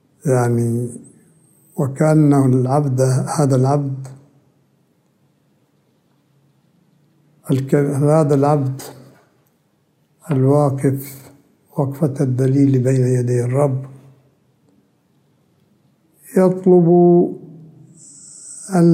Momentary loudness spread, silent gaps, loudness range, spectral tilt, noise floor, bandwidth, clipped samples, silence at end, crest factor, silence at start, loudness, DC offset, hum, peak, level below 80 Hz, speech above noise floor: 19 LU; none; 6 LU; -8.5 dB/octave; -61 dBFS; 16 kHz; under 0.1%; 0 s; 16 dB; 0.25 s; -16 LUFS; under 0.1%; none; -2 dBFS; -64 dBFS; 46 dB